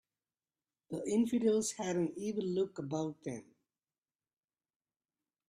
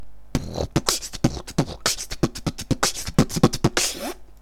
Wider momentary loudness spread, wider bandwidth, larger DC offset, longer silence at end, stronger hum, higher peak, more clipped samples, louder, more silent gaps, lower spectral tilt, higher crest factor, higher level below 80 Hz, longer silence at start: first, 14 LU vs 10 LU; second, 13.5 kHz vs 18 kHz; neither; first, 2.05 s vs 0 s; neither; second, -20 dBFS vs 0 dBFS; neither; second, -35 LUFS vs -24 LUFS; neither; first, -5.5 dB/octave vs -4 dB/octave; second, 18 dB vs 24 dB; second, -78 dBFS vs -36 dBFS; first, 0.9 s vs 0 s